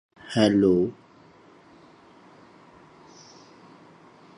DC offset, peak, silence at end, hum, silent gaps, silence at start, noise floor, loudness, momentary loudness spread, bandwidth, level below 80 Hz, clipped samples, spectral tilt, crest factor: under 0.1%; -6 dBFS; 3.45 s; none; none; 0.25 s; -53 dBFS; -22 LUFS; 29 LU; 11 kHz; -60 dBFS; under 0.1%; -6.5 dB/octave; 22 dB